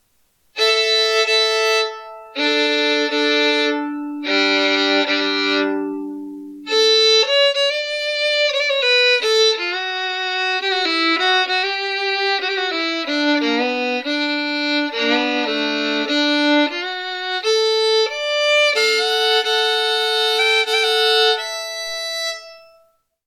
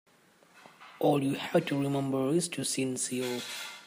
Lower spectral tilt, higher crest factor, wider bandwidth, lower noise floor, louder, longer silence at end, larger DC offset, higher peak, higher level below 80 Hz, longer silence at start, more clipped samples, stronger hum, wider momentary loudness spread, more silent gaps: second, -0.5 dB/octave vs -4.5 dB/octave; second, 12 dB vs 18 dB; about the same, 15.5 kHz vs 15.5 kHz; about the same, -61 dBFS vs -62 dBFS; first, -17 LUFS vs -30 LUFS; first, 0.7 s vs 0 s; neither; first, -6 dBFS vs -14 dBFS; about the same, -72 dBFS vs -76 dBFS; about the same, 0.55 s vs 0.55 s; neither; neither; first, 10 LU vs 6 LU; neither